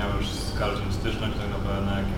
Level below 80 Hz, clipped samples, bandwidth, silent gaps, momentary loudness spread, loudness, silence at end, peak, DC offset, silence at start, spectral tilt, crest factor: -32 dBFS; under 0.1%; 17 kHz; none; 2 LU; -28 LUFS; 0 s; -14 dBFS; under 0.1%; 0 s; -6 dB/octave; 12 dB